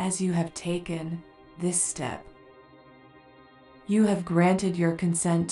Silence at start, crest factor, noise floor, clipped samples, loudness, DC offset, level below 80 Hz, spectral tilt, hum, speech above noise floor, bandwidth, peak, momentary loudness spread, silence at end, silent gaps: 0 s; 16 dB; -53 dBFS; under 0.1%; -26 LUFS; under 0.1%; -60 dBFS; -5.5 dB/octave; none; 28 dB; 12 kHz; -12 dBFS; 12 LU; 0 s; none